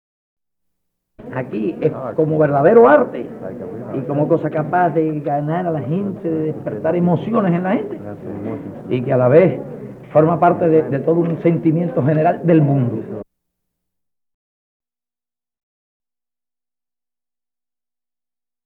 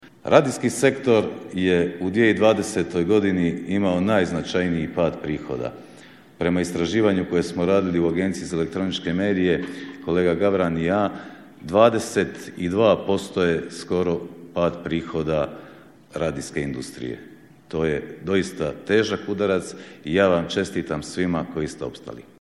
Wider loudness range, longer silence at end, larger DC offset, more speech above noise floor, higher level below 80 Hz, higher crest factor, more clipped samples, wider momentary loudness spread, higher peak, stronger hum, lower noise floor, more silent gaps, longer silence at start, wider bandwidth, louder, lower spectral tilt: about the same, 5 LU vs 6 LU; first, 5.4 s vs 0.2 s; neither; first, over 74 dB vs 25 dB; second, -58 dBFS vs -50 dBFS; about the same, 18 dB vs 22 dB; neither; first, 16 LU vs 12 LU; about the same, 0 dBFS vs 0 dBFS; neither; first, under -90 dBFS vs -47 dBFS; neither; first, 1.2 s vs 0.05 s; second, 4.2 kHz vs 13 kHz; first, -17 LUFS vs -22 LUFS; first, -11 dB/octave vs -6 dB/octave